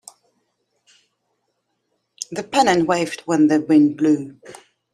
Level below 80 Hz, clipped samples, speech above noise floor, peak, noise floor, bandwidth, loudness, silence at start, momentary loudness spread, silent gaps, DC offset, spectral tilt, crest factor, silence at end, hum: -64 dBFS; under 0.1%; 55 dB; -2 dBFS; -72 dBFS; 12 kHz; -18 LUFS; 2.3 s; 15 LU; none; under 0.1%; -5 dB/octave; 18 dB; 0.4 s; none